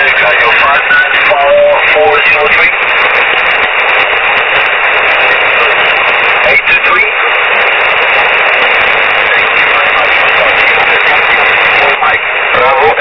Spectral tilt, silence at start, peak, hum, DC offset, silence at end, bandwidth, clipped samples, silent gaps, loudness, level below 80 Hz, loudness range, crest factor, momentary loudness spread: -3.5 dB/octave; 0 s; 0 dBFS; none; 0.5%; 0 s; 5.4 kHz; 1%; none; -6 LUFS; -40 dBFS; 1 LU; 8 dB; 2 LU